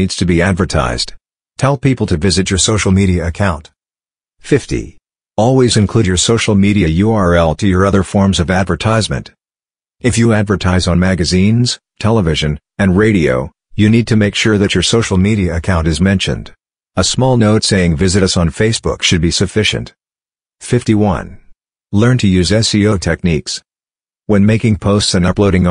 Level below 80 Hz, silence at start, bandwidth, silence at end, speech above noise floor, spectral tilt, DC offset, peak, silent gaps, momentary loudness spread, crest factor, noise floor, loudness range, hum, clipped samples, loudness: -30 dBFS; 0 s; 10.5 kHz; 0 s; over 78 dB; -5 dB/octave; under 0.1%; 0 dBFS; none; 8 LU; 12 dB; under -90 dBFS; 3 LU; none; under 0.1%; -13 LUFS